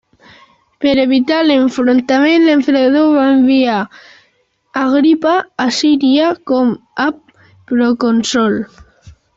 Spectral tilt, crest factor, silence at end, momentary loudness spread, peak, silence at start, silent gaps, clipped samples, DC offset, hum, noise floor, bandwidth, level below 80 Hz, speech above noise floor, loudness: -4.5 dB/octave; 10 dB; 0.25 s; 8 LU; -2 dBFS; 0.8 s; none; under 0.1%; under 0.1%; none; -59 dBFS; 7.8 kHz; -52 dBFS; 47 dB; -12 LUFS